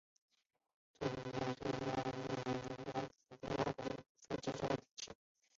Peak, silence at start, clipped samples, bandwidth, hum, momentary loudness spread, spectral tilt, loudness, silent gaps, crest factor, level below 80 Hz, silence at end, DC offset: -22 dBFS; 1 s; under 0.1%; 7.6 kHz; none; 10 LU; -5 dB/octave; -43 LUFS; 4.09-4.15 s, 4.91-4.95 s; 22 dB; -68 dBFS; 0.45 s; under 0.1%